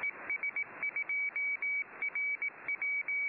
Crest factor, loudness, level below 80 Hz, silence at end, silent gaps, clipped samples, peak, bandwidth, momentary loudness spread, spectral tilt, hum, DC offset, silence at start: 8 dB; -33 LUFS; -84 dBFS; 0 s; none; under 0.1%; -28 dBFS; 4.8 kHz; 4 LU; -1 dB/octave; none; under 0.1%; 0 s